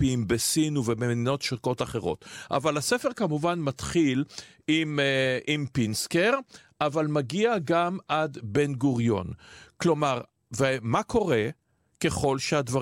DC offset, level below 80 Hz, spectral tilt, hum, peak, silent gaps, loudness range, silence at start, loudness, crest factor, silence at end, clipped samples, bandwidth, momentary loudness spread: under 0.1%; -54 dBFS; -5 dB/octave; none; -12 dBFS; none; 2 LU; 0 s; -27 LUFS; 16 dB; 0 s; under 0.1%; 16 kHz; 6 LU